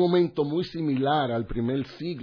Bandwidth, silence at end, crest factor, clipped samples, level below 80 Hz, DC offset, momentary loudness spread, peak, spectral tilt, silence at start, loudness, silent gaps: 5.4 kHz; 0 s; 14 dB; under 0.1%; -48 dBFS; under 0.1%; 6 LU; -10 dBFS; -8.5 dB/octave; 0 s; -26 LUFS; none